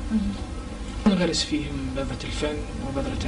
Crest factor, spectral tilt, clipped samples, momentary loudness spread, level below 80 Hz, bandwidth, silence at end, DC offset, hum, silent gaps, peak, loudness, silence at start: 18 dB; -5 dB/octave; under 0.1%; 12 LU; -34 dBFS; 10.5 kHz; 0 s; under 0.1%; none; none; -8 dBFS; -27 LUFS; 0 s